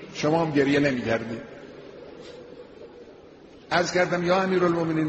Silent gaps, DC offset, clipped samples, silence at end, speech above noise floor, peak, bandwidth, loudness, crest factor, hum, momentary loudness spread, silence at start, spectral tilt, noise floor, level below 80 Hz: none; under 0.1%; under 0.1%; 0 s; 25 dB; -8 dBFS; 8.2 kHz; -23 LUFS; 18 dB; none; 23 LU; 0 s; -5.5 dB/octave; -48 dBFS; -58 dBFS